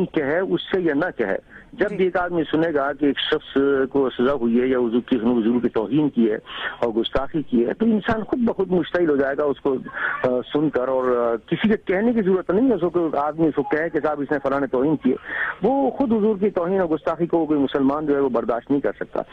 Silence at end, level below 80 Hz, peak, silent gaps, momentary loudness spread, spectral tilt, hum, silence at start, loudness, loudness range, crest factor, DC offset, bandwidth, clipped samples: 0.1 s; -50 dBFS; -6 dBFS; none; 4 LU; -8.5 dB/octave; none; 0 s; -21 LUFS; 1 LU; 14 dB; under 0.1%; 5.8 kHz; under 0.1%